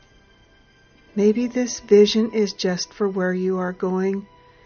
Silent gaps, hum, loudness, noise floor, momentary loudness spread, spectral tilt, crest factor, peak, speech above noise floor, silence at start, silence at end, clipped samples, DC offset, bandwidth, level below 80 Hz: none; none; -21 LUFS; -54 dBFS; 10 LU; -5 dB/octave; 18 dB; -4 dBFS; 34 dB; 1.15 s; 0.4 s; under 0.1%; under 0.1%; 6.8 kHz; -58 dBFS